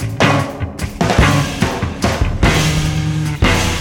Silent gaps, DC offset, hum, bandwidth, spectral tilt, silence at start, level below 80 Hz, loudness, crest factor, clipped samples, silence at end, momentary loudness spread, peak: none; under 0.1%; none; 17.5 kHz; -5 dB/octave; 0 s; -24 dBFS; -16 LUFS; 14 dB; under 0.1%; 0 s; 6 LU; 0 dBFS